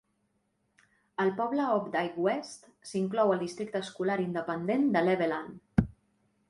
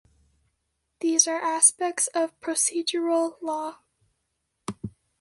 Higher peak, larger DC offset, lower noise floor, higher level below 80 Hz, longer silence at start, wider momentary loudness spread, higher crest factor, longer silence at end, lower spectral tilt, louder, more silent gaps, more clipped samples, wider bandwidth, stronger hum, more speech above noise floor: second, -10 dBFS vs -4 dBFS; neither; about the same, -76 dBFS vs -78 dBFS; first, -52 dBFS vs -66 dBFS; first, 1.2 s vs 1 s; second, 11 LU vs 19 LU; about the same, 22 dB vs 24 dB; first, 0.6 s vs 0.3 s; first, -6.5 dB/octave vs -1.5 dB/octave; second, -30 LUFS vs -23 LUFS; neither; neither; about the same, 11.5 kHz vs 12 kHz; neither; second, 46 dB vs 52 dB